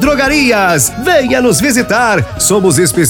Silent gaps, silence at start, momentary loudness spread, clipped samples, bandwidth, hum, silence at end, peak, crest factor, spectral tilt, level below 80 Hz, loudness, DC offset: none; 0 s; 2 LU; under 0.1%; 19 kHz; none; 0 s; 0 dBFS; 10 dB; -3.5 dB/octave; -32 dBFS; -10 LUFS; under 0.1%